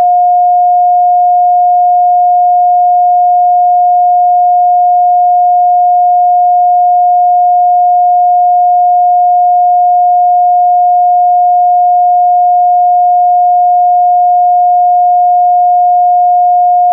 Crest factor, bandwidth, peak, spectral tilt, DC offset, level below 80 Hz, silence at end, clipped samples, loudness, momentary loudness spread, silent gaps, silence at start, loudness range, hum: 4 dB; 0.8 kHz; -4 dBFS; -8.5 dB/octave; under 0.1%; under -90 dBFS; 0 s; under 0.1%; -7 LUFS; 0 LU; none; 0 s; 0 LU; none